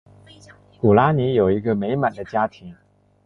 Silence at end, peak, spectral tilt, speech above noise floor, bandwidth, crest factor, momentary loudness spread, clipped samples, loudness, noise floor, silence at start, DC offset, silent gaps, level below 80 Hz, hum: 0.55 s; -2 dBFS; -9 dB/octave; 29 dB; 7 kHz; 18 dB; 8 LU; under 0.1%; -20 LUFS; -48 dBFS; 0.85 s; under 0.1%; none; -48 dBFS; 50 Hz at -40 dBFS